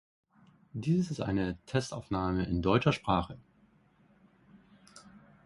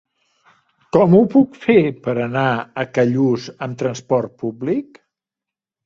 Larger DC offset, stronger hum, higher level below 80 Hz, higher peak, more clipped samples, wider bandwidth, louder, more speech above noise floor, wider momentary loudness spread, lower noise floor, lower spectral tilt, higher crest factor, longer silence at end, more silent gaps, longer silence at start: neither; neither; first, -50 dBFS vs -58 dBFS; second, -12 dBFS vs -2 dBFS; neither; first, 11.5 kHz vs 7.6 kHz; second, -31 LUFS vs -18 LUFS; second, 35 dB vs 70 dB; about the same, 11 LU vs 12 LU; second, -65 dBFS vs -87 dBFS; about the same, -6.5 dB/octave vs -7.5 dB/octave; first, 22 dB vs 16 dB; second, 0.25 s vs 1.05 s; neither; second, 0.75 s vs 0.95 s